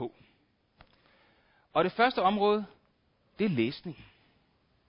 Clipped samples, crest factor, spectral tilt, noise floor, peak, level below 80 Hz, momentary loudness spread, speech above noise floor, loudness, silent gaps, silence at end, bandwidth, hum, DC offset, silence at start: under 0.1%; 20 dB; -9.5 dB/octave; -70 dBFS; -12 dBFS; -68 dBFS; 19 LU; 42 dB; -28 LUFS; none; 0.85 s; 5.6 kHz; none; under 0.1%; 0 s